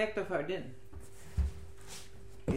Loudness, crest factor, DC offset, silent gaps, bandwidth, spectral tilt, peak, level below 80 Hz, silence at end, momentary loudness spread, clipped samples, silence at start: -39 LUFS; 18 dB; 0.5%; none; 16 kHz; -6 dB/octave; -20 dBFS; -44 dBFS; 0 s; 17 LU; under 0.1%; 0 s